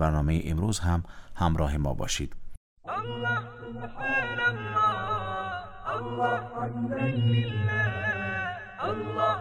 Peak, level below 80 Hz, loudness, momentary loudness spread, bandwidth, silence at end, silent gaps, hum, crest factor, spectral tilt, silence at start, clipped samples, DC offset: -12 dBFS; -40 dBFS; -29 LUFS; 9 LU; 15.5 kHz; 0 s; 2.57-2.77 s; none; 16 dB; -5.5 dB/octave; 0 s; under 0.1%; under 0.1%